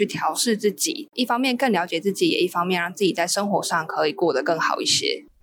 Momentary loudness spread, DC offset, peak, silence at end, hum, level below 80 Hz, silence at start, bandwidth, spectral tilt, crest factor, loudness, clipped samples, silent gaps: 4 LU; under 0.1%; -8 dBFS; 0.2 s; none; -70 dBFS; 0 s; 19.5 kHz; -3 dB/octave; 14 dB; -22 LUFS; under 0.1%; none